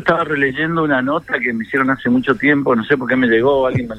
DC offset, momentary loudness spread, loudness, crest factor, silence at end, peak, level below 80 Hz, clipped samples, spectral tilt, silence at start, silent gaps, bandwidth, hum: under 0.1%; 5 LU; -16 LUFS; 14 dB; 0 s; -2 dBFS; -48 dBFS; under 0.1%; -7.5 dB/octave; 0 s; none; 8.4 kHz; none